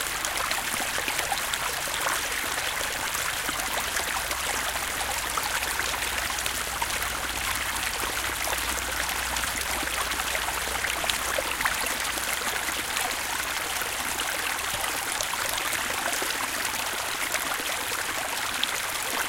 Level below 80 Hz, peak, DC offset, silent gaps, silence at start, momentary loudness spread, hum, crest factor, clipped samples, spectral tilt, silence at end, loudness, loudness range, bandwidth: -46 dBFS; -4 dBFS; under 0.1%; none; 0 s; 2 LU; none; 26 dB; under 0.1%; -0.5 dB/octave; 0 s; -27 LUFS; 1 LU; 17 kHz